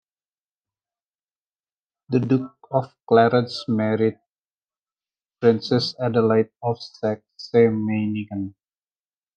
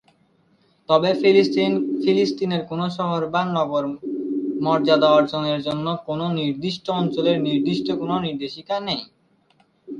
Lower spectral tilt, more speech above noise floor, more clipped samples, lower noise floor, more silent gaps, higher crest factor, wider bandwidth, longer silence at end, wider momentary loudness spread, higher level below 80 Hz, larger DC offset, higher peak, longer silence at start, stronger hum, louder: about the same, -7.5 dB/octave vs -7 dB/octave; first, over 69 dB vs 40 dB; neither; first, under -90 dBFS vs -61 dBFS; first, 4.38-4.43 s, 4.54-4.59 s vs none; about the same, 20 dB vs 18 dB; about the same, 8.8 kHz vs 9.2 kHz; first, 0.85 s vs 0 s; about the same, 10 LU vs 10 LU; second, -70 dBFS vs -62 dBFS; neither; about the same, -4 dBFS vs -2 dBFS; first, 2.1 s vs 0.9 s; neither; about the same, -22 LUFS vs -21 LUFS